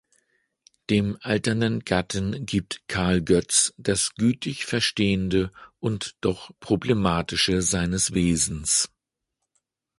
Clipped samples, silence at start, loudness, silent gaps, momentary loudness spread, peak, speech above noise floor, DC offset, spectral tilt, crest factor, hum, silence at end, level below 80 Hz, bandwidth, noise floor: under 0.1%; 0.9 s; -24 LUFS; none; 8 LU; -4 dBFS; 58 dB; under 0.1%; -4 dB/octave; 20 dB; none; 1.15 s; -44 dBFS; 11.5 kHz; -82 dBFS